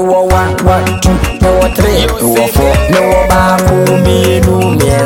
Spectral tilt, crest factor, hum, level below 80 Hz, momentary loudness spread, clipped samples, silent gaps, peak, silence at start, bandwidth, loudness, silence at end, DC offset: -5.5 dB/octave; 8 dB; none; -18 dBFS; 2 LU; under 0.1%; none; 0 dBFS; 0 s; 17.5 kHz; -9 LUFS; 0 s; under 0.1%